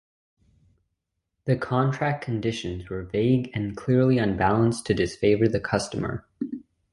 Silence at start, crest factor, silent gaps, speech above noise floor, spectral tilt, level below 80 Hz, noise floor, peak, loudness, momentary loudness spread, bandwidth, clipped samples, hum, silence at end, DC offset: 1.45 s; 18 dB; none; 56 dB; -7 dB/octave; -48 dBFS; -80 dBFS; -8 dBFS; -25 LUFS; 12 LU; 11.5 kHz; under 0.1%; none; 0.35 s; under 0.1%